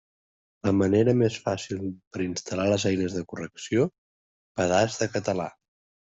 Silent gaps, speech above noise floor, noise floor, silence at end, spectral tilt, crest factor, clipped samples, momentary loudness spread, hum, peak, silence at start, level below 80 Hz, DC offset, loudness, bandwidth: 2.07-2.11 s, 3.98-4.55 s; over 65 dB; under -90 dBFS; 0.6 s; -5.5 dB/octave; 18 dB; under 0.1%; 12 LU; none; -8 dBFS; 0.65 s; -62 dBFS; under 0.1%; -26 LUFS; 8.2 kHz